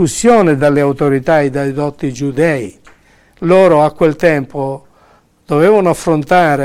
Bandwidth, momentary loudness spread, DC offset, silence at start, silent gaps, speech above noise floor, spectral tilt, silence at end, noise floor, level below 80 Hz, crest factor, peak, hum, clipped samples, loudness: 15.5 kHz; 11 LU; under 0.1%; 0 s; none; 38 dB; -6 dB/octave; 0 s; -49 dBFS; -44 dBFS; 12 dB; 0 dBFS; none; under 0.1%; -12 LUFS